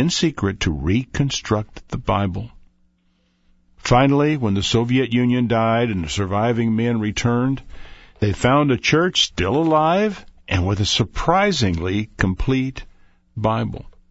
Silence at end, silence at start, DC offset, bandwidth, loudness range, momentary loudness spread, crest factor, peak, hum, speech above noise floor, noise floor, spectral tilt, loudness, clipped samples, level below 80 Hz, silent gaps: 0.2 s; 0 s; under 0.1%; 8 kHz; 4 LU; 9 LU; 18 dB; -2 dBFS; none; 44 dB; -63 dBFS; -5.5 dB/octave; -19 LUFS; under 0.1%; -38 dBFS; none